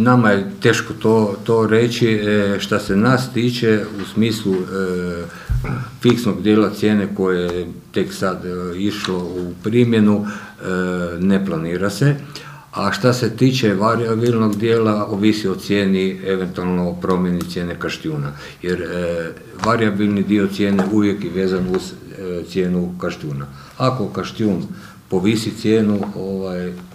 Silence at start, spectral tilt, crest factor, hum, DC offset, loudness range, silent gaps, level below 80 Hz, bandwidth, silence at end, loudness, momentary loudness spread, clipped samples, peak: 0 s; -6.5 dB/octave; 18 dB; none; under 0.1%; 5 LU; none; -42 dBFS; 15.5 kHz; 0 s; -19 LUFS; 10 LU; under 0.1%; 0 dBFS